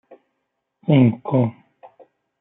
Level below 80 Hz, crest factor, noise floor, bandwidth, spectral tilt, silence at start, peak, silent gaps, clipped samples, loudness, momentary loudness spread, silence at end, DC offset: -68 dBFS; 18 dB; -76 dBFS; 3.9 kHz; -13 dB/octave; 0.9 s; -4 dBFS; none; under 0.1%; -19 LUFS; 10 LU; 0.9 s; under 0.1%